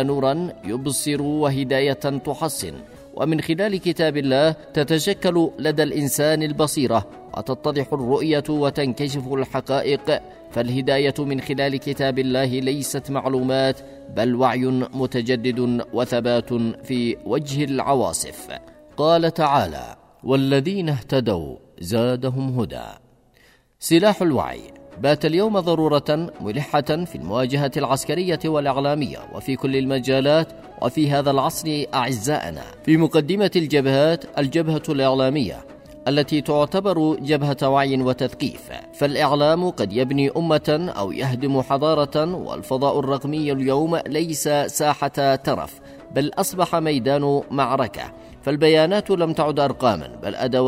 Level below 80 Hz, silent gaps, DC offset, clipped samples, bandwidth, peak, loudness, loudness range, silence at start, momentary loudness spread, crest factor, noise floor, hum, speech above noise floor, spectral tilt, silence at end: -52 dBFS; none; under 0.1%; under 0.1%; 16 kHz; -4 dBFS; -21 LUFS; 3 LU; 0 s; 9 LU; 16 dB; -56 dBFS; none; 35 dB; -5.5 dB/octave; 0 s